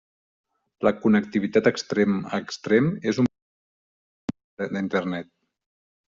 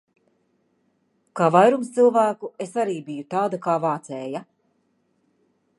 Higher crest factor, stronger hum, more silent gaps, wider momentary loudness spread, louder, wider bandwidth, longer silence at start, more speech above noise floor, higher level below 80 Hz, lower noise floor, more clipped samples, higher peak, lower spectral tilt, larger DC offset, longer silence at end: about the same, 20 dB vs 22 dB; neither; first, 3.42-4.28 s, 4.44-4.57 s vs none; about the same, 13 LU vs 15 LU; about the same, -24 LUFS vs -22 LUFS; second, 7.6 kHz vs 11.5 kHz; second, 0.8 s vs 1.35 s; first, over 67 dB vs 47 dB; first, -64 dBFS vs -78 dBFS; first, under -90 dBFS vs -68 dBFS; neither; second, -6 dBFS vs -2 dBFS; about the same, -5.5 dB/octave vs -6.5 dB/octave; neither; second, 0.85 s vs 1.35 s